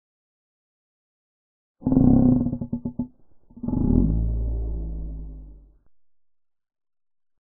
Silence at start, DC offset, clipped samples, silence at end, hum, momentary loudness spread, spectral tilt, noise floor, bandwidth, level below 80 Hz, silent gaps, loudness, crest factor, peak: 1.8 s; under 0.1%; under 0.1%; 1.9 s; none; 18 LU; -17 dB/octave; -53 dBFS; 1.5 kHz; -32 dBFS; none; -23 LUFS; 22 dB; -4 dBFS